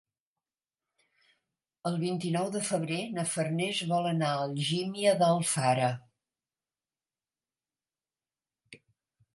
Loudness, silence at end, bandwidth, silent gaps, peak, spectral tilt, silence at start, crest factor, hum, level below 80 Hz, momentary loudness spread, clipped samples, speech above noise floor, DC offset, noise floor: -30 LUFS; 0.6 s; 11.5 kHz; none; -12 dBFS; -4.5 dB/octave; 1.85 s; 20 dB; none; -78 dBFS; 7 LU; under 0.1%; over 61 dB; under 0.1%; under -90 dBFS